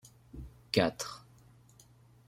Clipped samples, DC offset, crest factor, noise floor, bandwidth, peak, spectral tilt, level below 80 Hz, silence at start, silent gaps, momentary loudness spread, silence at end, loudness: under 0.1%; under 0.1%; 26 dB; -61 dBFS; 16 kHz; -12 dBFS; -4.5 dB/octave; -58 dBFS; 0.05 s; none; 21 LU; 1.1 s; -33 LUFS